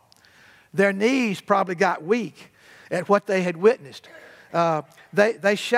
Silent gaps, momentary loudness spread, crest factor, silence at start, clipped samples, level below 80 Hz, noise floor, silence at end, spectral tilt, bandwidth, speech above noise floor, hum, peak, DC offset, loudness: none; 10 LU; 20 dB; 0.75 s; under 0.1%; -78 dBFS; -54 dBFS; 0 s; -5.5 dB/octave; 15 kHz; 32 dB; none; -4 dBFS; under 0.1%; -22 LUFS